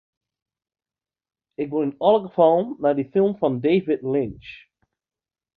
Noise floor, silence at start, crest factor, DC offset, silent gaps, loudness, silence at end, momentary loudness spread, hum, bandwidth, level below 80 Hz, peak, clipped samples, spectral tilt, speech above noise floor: under -90 dBFS; 1.6 s; 20 dB; under 0.1%; none; -21 LUFS; 1 s; 14 LU; none; 4.7 kHz; -60 dBFS; -4 dBFS; under 0.1%; -10 dB/octave; over 69 dB